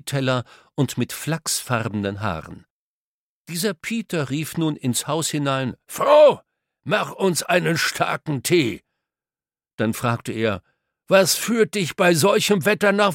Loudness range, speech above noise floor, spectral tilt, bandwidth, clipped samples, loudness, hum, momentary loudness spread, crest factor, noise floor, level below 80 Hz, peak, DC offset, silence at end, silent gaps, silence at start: 7 LU; over 69 dB; -4.5 dB/octave; 17 kHz; under 0.1%; -21 LUFS; none; 10 LU; 20 dB; under -90 dBFS; -58 dBFS; -2 dBFS; under 0.1%; 0 s; 2.70-3.45 s, 9.74-9.78 s; 0.05 s